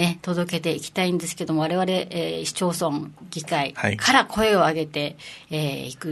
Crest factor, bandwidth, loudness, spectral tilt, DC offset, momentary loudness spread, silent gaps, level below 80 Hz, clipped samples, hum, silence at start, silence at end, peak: 22 dB; 12.5 kHz; -23 LUFS; -4.5 dB/octave; under 0.1%; 13 LU; none; -56 dBFS; under 0.1%; none; 0 s; 0 s; 0 dBFS